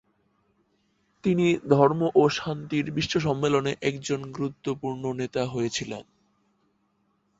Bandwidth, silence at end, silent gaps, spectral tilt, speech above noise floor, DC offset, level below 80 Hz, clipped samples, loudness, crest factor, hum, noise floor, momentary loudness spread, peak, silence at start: 8 kHz; 1.4 s; none; -6 dB/octave; 45 dB; under 0.1%; -60 dBFS; under 0.1%; -26 LUFS; 22 dB; none; -70 dBFS; 11 LU; -4 dBFS; 1.25 s